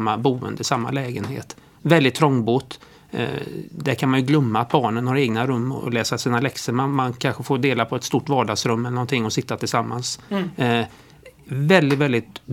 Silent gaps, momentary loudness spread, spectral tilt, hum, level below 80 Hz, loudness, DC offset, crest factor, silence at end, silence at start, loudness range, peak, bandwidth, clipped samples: none; 11 LU; -5.5 dB/octave; none; -60 dBFS; -21 LUFS; under 0.1%; 20 dB; 0 s; 0 s; 2 LU; 0 dBFS; 17 kHz; under 0.1%